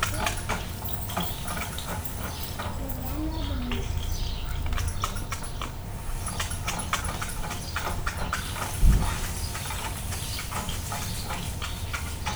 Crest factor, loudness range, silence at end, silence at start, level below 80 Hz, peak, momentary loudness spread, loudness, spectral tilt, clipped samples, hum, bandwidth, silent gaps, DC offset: 22 dB; 3 LU; 0 s; 0 s; -32 dBFS; -8 dBFS; 5 LU; -31 LUFS; -3.5 dB/octave; under 0.1%; none; over 20 kHz; none; under 0.1%